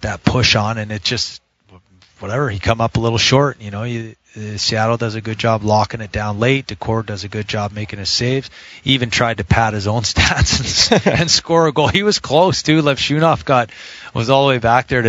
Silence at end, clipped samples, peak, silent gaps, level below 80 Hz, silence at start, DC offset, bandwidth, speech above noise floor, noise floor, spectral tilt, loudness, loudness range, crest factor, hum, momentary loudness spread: 0 s; under 0.1%; 0 dBFS; none; -36 dBFS; 0 s; under 0.1%; 8 kHz; 33 dB; -49 dBFS; -4.5 dB/octave; -16 LUFS; 5 LU; 16 dB; none; 11 LU